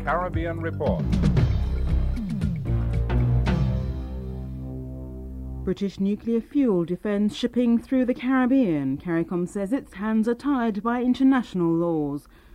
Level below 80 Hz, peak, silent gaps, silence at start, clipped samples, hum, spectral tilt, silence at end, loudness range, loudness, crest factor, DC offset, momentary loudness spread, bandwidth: -32 dBFS; -8 dBFS; none; 0 s; under 0.1%; none; -8.5 dB/octave; 0.35 s; 4 LU; -25 LUFS; 16 dB; under 0.1%; 13 LU; 11 kHz